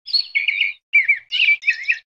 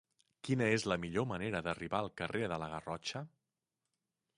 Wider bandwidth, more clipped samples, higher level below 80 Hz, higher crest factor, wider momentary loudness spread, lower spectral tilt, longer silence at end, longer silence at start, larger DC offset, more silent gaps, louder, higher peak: second, 9.4 kHz vs 11.5 kHz; neither; second, -76 dBFS vs -64 dBFS; second, 14 dB vs 22 dB; second, 5 LU vs 10 LU; second, 4.5 dB/octave vs -5.5 dB/octave; second, 0.15 s vs 1.1 s; second, 0.05 s vs 0.45 s; neither; first, 0.83-0.93 s vs none; first, -16 LUFS vs -37 LUFS; first, -6 dBFS vs -18 dBFS